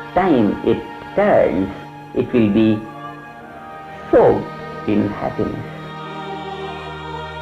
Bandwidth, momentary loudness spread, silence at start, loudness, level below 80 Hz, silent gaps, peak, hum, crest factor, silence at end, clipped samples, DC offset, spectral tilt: 8.2 kHz; 19 LU; 0 s; -19 LUFS; -44 dBFS; none; -2 dBFS; none; 16 dB; 0 s; under 0.1%; under 0.1%; -8.5 dB/octave